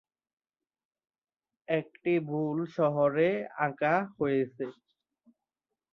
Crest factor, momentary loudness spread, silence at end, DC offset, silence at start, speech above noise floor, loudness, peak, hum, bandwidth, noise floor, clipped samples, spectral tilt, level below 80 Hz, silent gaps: 20 dB; 7 LU; 1.2 s; under 0.1%; 1.7 s; 60 dB; -30 LUFS; -12 dBFS; none; 6.8 kHz; -89 dBFS; under 0.1%; -9 dB/octave; -74 dBFS; none